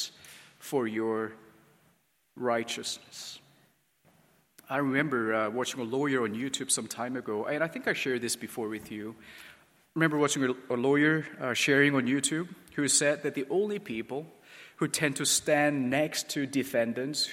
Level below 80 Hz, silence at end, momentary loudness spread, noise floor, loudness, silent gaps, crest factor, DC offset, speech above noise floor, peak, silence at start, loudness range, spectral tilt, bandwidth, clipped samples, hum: -74 dBFS; 0 s; 15 LU; -69 dBFS; -29 LUFS; none; 22 dB; under 0.1%; 40 dB; -10 dBFS; 0 s; 8 LU; -3.5 dB/octave; 16.5 kHz; under 0.1%; none